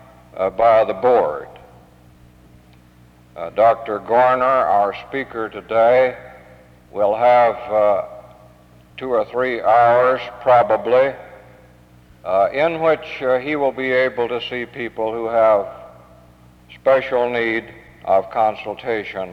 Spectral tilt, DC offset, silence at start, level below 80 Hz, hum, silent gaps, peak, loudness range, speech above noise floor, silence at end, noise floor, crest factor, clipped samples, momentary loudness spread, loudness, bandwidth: -6.5 dB/octave; under 0.1%; 0.35 s; -54 dBFS; none; none; -4 dBFS; 3 LU; 31 dB; 0 s; -48 dBFS; 16 dB; under 0.1%; 13 LU; -18 LUFS; 6.6 kHz